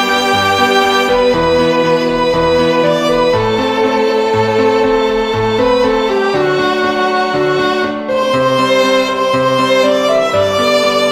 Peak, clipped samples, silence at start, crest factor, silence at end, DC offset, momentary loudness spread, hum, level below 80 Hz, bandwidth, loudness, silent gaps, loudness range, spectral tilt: 0 dBFS; under 0.1%; 0 s; 12 dB; 0 s; under 0.1%; 3 LU; none; -38 dBFS; 16 kHz; -12 LUFS; none; 2 LU; -4.5 dB/octave